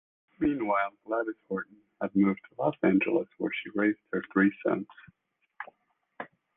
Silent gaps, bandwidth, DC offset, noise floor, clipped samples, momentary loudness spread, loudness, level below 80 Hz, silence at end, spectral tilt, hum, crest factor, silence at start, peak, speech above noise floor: none; 3.8 kHz; under 0.1%; -73 dBFS; under 0.1%; 19 LU; -29 LUFS; -64 dBFS; 0.3 s; -10 dB/octave; none; 18 dB; 0.4 s; -12 dBFS; 44 dB